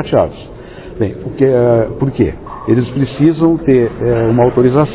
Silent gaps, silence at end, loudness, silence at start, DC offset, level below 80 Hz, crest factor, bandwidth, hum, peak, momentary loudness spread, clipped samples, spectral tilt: none; 0 s; -13 LUFS; 0 s; under 0.1%; -34 dBFS; 12 dB; 4 kHz; none; 0 dBFS; 12 LU; under 0.1%; -12.5 dB/octave